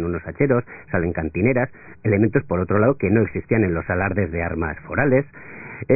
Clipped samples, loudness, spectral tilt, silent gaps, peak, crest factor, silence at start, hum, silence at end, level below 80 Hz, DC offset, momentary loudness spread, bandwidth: under 0.1%; -21 LUFS; -16 dB/octave; none; -2 dBFS; 18 dB; 0 s; none; 0 s; -38 dBFS; under 0.1%; 9 LU; 2.7 kHz